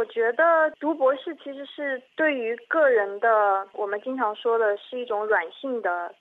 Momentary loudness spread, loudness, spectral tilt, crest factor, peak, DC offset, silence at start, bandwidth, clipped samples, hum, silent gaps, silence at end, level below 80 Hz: 11 LU; -24 LUFS; -5.5 dB/octave; 14 dB; -10 dBFS; under 0.1%; 0 s; 4.1 kHz; under 0.1%; none; none; 0.1 s; -88 dBFS